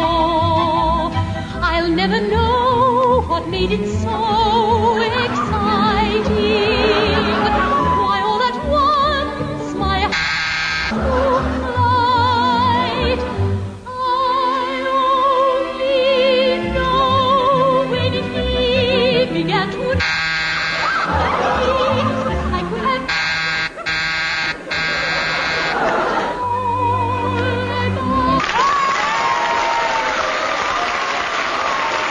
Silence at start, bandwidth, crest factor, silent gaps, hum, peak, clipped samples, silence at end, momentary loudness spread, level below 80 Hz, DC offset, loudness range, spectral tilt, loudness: 0 s; 10.5 kHz; 14 dB; none; none; -4 dBFS; under 0.1%; 0 s; 5 LU; -32 dBFS; under 0.1%; 2 LU; -5 dB/octave; -17 LUFS